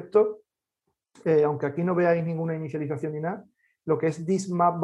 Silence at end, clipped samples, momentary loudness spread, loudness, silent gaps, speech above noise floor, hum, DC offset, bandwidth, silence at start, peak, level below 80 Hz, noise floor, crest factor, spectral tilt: 0 s; under 0.1%; 10 LU; -26 LUFS; none; 55 dB; none; under 0.1%; 10.5 kHz; 0 s; -8 dBFS; -72 dBFS; -80 dBFS; 18 dB; -7.5 dB/octave